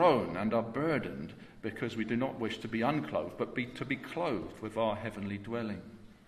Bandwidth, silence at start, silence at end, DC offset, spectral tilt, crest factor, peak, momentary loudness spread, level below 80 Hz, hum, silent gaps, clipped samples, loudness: 13.5 kHz; 0 s; 0.15 s; under 0.1%; -7 dB/octave; 22 dB; -12 dBFS; 10 LU; -62 dBFS; none; none; under 0.1%; -35 LUFS